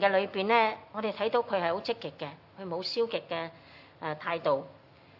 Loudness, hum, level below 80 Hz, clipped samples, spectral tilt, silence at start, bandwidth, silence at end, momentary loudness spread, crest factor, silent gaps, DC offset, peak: -31 LUFS; none; -78 dBFS; under 0.1%; -6 dB/octave; 0 s; 6 kHz; 0.45 s; 15 LU; 22 dB; none; under 0.1%; -10 dBFS